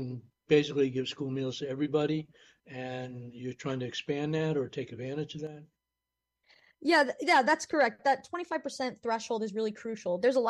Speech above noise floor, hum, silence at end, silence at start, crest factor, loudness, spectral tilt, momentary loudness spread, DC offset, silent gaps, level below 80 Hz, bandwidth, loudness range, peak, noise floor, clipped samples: 57 dB; none; 0 s; 0 s; 20 dB; -31 LUFS; -5 dB/octave; 15 LU; under 0.1%; none; -72 dBFS; 12 kHz; 7 LU; -12 dBFS; -88 dBFS; under 0.1%